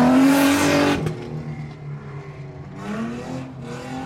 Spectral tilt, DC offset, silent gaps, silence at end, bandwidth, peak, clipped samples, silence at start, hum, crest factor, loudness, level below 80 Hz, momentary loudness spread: -5 dB/octave; under 0.1%; none; 0 s; 16.5 kHz; -6 dBFS; under 0.1%; 0 s; none; 14 dB; -20 LUFS; -50 dBFS; 20 LU